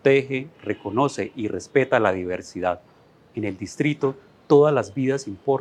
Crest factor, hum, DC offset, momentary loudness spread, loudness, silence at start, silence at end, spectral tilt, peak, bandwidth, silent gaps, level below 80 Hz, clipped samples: 20 dB; none; under 0.1%; 12 LU; -23 LUFS; 0.05 s; 0 s; -6.5 dB/octave; -4 dBFS; 9.8 kHz; none; -66 dBFS; under 0.1%